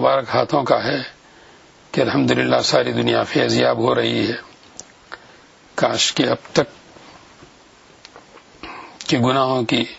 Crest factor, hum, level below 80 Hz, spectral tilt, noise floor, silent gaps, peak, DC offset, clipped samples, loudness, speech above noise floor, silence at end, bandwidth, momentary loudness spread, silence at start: 20 dB; none; -56 dBFS; -4.5 dB/octave; -48 dBFS; none; 0 dBFS; under 0.1%; under 0.1%; -18 LUFS; 31 dB; 0 s; 8 kHz; 22 LU; 0 s